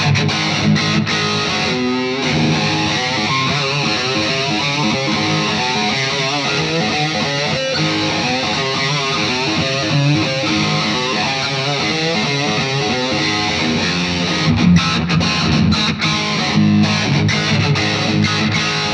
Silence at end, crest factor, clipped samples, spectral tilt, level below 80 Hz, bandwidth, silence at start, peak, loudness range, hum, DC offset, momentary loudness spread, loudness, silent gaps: 0 s; 16 dB; under 0.1%; -4.5 dB/octave; -42 dBFS; 10 kHz; 0 s; 0 dBFS; 2 LU; none; under 0.1%; 3 LU; -15 LUFS; none